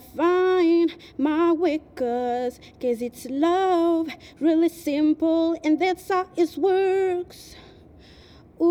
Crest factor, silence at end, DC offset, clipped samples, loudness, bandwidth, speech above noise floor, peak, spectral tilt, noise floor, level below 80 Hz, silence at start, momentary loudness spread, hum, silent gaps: 12 dB; 0 s; under 0.1%; under 0.1%; -23 LUFS; 15.5 kHz; 26 dB; -10 dBFS; -5 dB/octave; -49 dBFS; -58 dBFS; 0.15 s; 9 LU; none; none